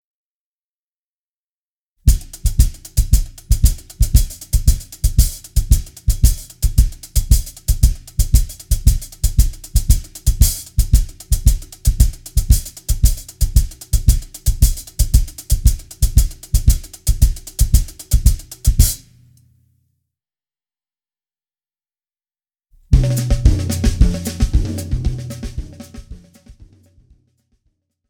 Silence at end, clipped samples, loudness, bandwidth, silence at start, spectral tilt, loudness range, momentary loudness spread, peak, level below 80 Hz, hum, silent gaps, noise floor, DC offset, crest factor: 1.55 s; under 0.1%; -19 LUFS; 19 kHz; 2.05 s; -4.5 dB/octave; 5 LU; 6 LU; 0 dBFS; -18 dBFS; none; none; under -90 dBFS; under 0.1%; 16 dB